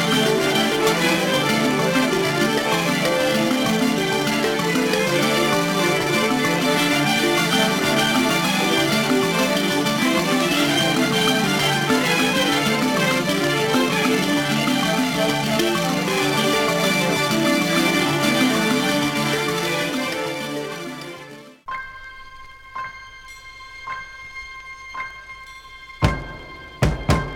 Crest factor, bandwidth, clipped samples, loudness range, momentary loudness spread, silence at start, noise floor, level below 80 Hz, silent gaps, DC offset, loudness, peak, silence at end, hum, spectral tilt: 20 dB; 18 kHz; under 0.1%; 15 LU; 17 LU; 0 s; -40 dBFS; -42 dBFS; none; under 0.1%; -19 LUFS; 0 dBFS; 0 s; none; -4 dB/octave